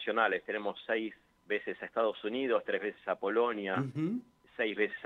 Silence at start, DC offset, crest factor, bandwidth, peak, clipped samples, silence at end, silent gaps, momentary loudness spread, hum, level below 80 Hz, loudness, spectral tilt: 0 s; under 0.1%; 20 dB; 7 kHz; -14 dBFS; under 0.1%; 0 s; none; 6 LU; none; -78 dBFS; -34 LUFS; -7.5 dB/octave